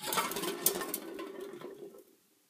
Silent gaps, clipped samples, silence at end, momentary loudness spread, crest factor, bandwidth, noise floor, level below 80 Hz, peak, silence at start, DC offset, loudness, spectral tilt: none; under 0.1%; 0.45 s; 18 LU; 28 dB; 16 kHz; -63 dBFS; -76 dBFS; -10 dBFS; 0 s; under 0.1%; -35 LUFS; -1.5 dB/octave